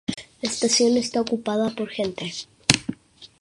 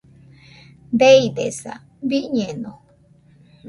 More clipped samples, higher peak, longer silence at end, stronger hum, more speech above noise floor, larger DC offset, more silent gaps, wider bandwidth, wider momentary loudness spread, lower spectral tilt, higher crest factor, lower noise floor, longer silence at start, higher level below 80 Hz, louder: neither; about the same, 0 dBFS vs -2 dBFS; first, 0.15 s vs 0 s; neither; second, 23 dB vs 35 dB; neither; neither; about the same, 11.5 kHz vs 11.5 kHz; second, 13 LU vs 20 LU; second, -3 dB/octave vs -4.5 dB/octave; about the same, 24 dB vs 20 dB; second, -46 dBFS vs -53 dBFS; second, 0.1 s vs 0.9 s; about the same, -54 dBFS vs -58 dBFS; second, -23 LUFS vs -18 LUFS